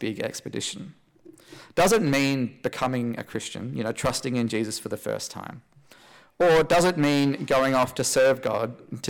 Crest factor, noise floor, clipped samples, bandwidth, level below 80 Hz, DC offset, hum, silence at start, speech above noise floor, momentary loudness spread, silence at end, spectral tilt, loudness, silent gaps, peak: 12 dB; -53 dBFS; under 0.1%; 18 kHz; -54 dBFS; under 0.1%; none; 0 s; 28 dB; 12 LU; 0 s; -4.5 dB/octave; -24 LUFS; none; -14 dBFS